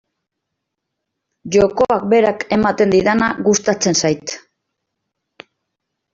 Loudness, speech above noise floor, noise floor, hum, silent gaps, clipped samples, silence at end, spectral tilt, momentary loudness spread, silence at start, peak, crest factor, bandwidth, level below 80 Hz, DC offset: -15 LUFS; 63 dB; -78 dBFS; none; none; under 0.1%; 1.75 s; -4 dB/octave; 6 LU; 1.45 s; -2 dBFS; 16 dB; 7.8 kHz; -48 dBFS; under 0.1%